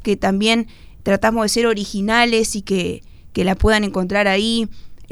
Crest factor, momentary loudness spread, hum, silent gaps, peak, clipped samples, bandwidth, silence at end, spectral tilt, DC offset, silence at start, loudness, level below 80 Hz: 18 dB; 11 LU; none; none; 0 dBFS; under 0.1%; 19 kHz; 0 s; -4 dB/octave; under 0.1%; 0 s; -18 LUFS; -34 dBFS